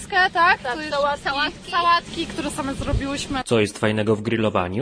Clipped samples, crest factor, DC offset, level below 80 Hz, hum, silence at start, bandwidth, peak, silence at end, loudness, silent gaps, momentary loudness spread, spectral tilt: under 0.1%; 16 dB; under 0.1%; -38 dBFS; none; 0 s; 11 kHz; -4 dBFS; 0 s; -21 LUFS; none; 9 LU; -4.5 dB/octave